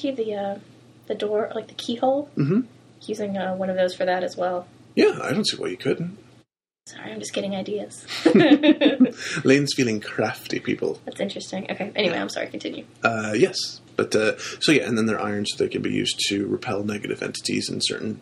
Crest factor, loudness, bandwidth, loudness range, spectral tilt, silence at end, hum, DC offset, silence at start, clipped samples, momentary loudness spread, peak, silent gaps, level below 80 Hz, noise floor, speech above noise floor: 20 dB; -23 LUFS; 13.5 kHz; 6 LU; -4.5 dB/octave; 0 s; none; under 0.1%; 0 s; under 0.1%; 12 LU; -4 dBFS; none; -64 dBFS; -60 dBFS; 37 dB